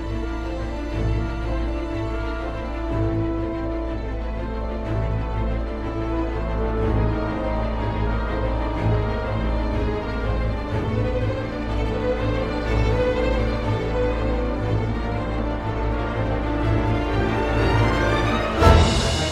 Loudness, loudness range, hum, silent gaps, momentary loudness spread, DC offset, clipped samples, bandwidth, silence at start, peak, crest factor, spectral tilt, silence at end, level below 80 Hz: -24 LUFS; 4 LU; none; none; 8 LU; under 0.1%; under 0.1%; 10.5 kHz; 0 s; 0 dBFS; 22 dB; -6.5 dB/octave; 0 s; -26 dBFS